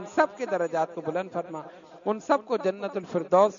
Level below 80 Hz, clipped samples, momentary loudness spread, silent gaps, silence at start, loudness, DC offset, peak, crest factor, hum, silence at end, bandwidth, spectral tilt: -78 dBFS; under 0.1%; 10 LU; none; 0 s; -28 LUFS; under 0.1%; -8 dBFS; 20 dB; none; 0 s; 7.4 kHz; -6 dB/octave